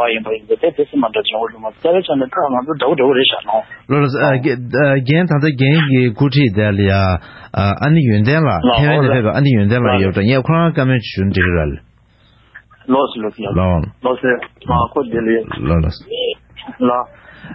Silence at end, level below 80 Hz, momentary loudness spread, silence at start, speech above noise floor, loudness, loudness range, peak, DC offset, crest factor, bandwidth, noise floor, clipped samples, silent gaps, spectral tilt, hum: 0 s; -32 dBFS; 8 LU; 0 s; 36 dB; -15 LUFS; 5 LU; 0 dBFS; under 0.1%; 14 dB; 5.8 kHz; -50 dBFS; under 0.1%; none; -10.5 dB/octave; none